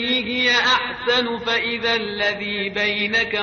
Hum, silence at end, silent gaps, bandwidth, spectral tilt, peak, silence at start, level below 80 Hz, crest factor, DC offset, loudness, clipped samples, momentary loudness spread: none; 0 s; none; 6.8 kHz; 0 dB/octave; -6 dBFS; 0 s; -52 dBFS; 14 dB; under 0.1%; -19 LUFS; under 0.1%; 6 LU